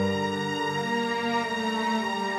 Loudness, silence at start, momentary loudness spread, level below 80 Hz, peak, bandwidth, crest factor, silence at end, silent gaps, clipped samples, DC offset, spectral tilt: -27 LUFS; 0 s; 1 LU; -68 dBFS; -14 dBFS; 15 kHz; 12 dB; 0 s; none; under 0.1%; under 0.1%; -4.5 dB/octave